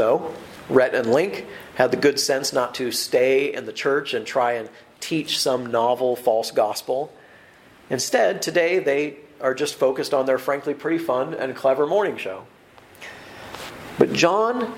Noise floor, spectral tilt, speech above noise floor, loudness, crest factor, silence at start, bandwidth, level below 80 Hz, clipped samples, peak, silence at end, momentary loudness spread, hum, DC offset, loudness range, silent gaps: -50 dBFS; -3.5 dB/octave; 28 dB; -22 LUFS; 22 dB; 0 s; 16.5 kHz; -64 dBFS; under 0.1%; 0 dBFS; 0 s; 16 LU; none; under 0.1%; 3 LU; none